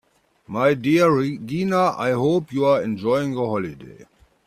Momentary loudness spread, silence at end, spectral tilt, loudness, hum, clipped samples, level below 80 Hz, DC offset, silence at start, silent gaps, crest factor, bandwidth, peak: 9 LU; 0.45 s; -7 dB/octave; -20 LUFS; none; under 0.1%; -60 dBFS; under 0.1%; 0.5 s; none; 16 dB; 14.5 kHz; -4 dBFS